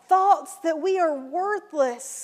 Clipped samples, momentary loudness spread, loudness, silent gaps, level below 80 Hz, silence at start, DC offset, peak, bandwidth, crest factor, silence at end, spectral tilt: under 0.1%; 8 LU; -24 LUFS; none; -88 dBFS; 0.1 s; under 0.1%; -8 dBFS; 15.5 kHz; 16 dB; 0 s; -1.5 dB/octave